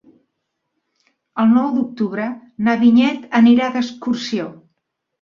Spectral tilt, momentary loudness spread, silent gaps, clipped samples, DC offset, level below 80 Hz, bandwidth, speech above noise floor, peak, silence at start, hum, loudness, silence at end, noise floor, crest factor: -6 dB/octave; 13 LU; none; under 0.1%; under 0.1%; -62 dBFS; 7.2 kHz; 59 dB; -2 dBFS; 1.35 s; none; -17 LUFS; 0.7 s; -75 dBFS; 16 dB